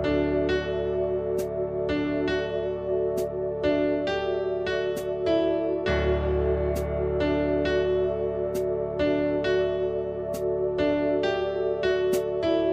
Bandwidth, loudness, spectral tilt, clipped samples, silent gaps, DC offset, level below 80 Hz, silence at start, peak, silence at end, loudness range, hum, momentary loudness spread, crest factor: 15 kHz; -26 LUFS; -6.5 dB/octave; under 0.1%; none; under 0.1%; -40 dBFS; 0 s; -12 dBFS; 0 s; 2 LU; none; 4 LU; 14 dB